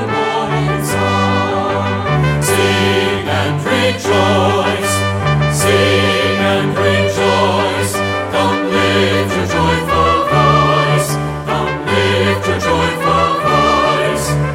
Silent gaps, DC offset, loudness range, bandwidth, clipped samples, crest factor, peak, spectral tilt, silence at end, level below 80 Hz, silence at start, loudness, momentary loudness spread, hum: none; under 0.1%; 1 LU; 16.5 kHz; under 0.1%; 14 dB; 0 dBFS; -5 dB/octave; 0 s; -34 dBFS; 0 s; -14 LUFS; 4 LU; none